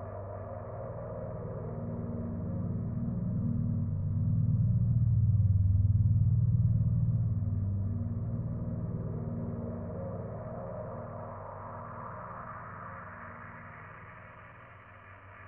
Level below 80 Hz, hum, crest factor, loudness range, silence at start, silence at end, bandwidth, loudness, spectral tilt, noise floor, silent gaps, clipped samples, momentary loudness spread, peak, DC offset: -44 dBFS; none; 16 dB; 16 LU; 0 s; 0 s; 2.6 kHz; -33 LUFS; -9.5 dB/octave; -52 dBFS; none; under 0.1%; 20 LU; -16 dBFS; under 0.1%